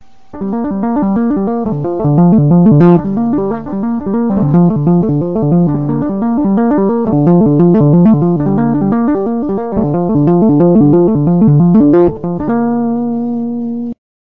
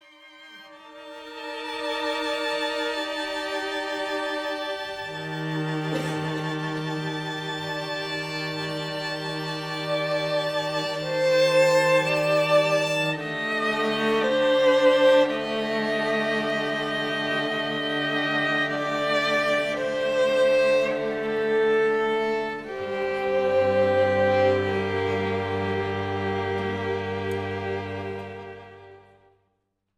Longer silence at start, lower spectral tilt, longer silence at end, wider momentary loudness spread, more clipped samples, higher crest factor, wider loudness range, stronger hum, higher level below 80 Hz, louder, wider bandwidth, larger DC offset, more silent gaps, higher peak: first, 0.35 s vs 0.2 s; first, -13 dB/octave vs -5 dB/octave; second, 0.4 s vs 1 s; about the same, 9 LU vs 11 LU; neither; second, 10 dB vs 18 dB; second, 2 LU vs 7 LU; neither; first, -40 dBFS vs -62 dBFS; first, -11 LUFS vs -24 LUFS; second, 3 kHz vs 17.5 kHz; first, 2% vs under 0.1%; neither; first, 0 dBFS vs -8 dBFS